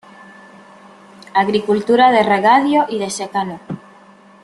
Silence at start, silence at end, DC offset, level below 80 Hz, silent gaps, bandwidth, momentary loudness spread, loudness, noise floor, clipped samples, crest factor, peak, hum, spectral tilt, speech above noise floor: 1.35 s; 0.65 s; under 0.1%; -62 dBFS; none; 12 kHz; 15 LU; -15 LUFS; -45 dBFS; under 0.1%; 16 dB; -2 dBFS; none; -4.5 dB/octave; 30 dB